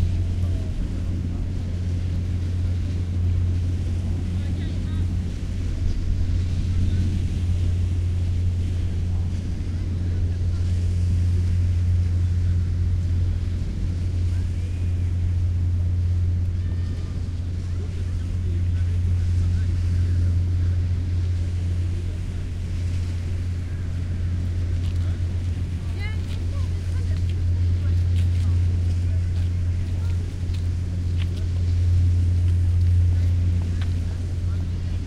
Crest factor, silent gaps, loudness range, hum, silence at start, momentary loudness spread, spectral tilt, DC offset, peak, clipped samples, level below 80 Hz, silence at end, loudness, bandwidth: 14 dB; none; 4 LU; none; 0 s; 6 LU; -7.5 dB/octave; under 0.1%; -8 dBFS; under 0.1%; -30 dBFS; 0 s; -25 LUFS; 7.6 kHz